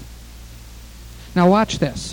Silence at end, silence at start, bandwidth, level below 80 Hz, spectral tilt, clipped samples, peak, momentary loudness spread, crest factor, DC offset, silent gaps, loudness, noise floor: 0 s; 0 s; 18.5 kHz; -38 dBFS; -6 dB/octave; under 0.1%; -4 dBFS; 25 LU; 18 dB; under 0.1%; none; -18 LUFS; -38 dBFS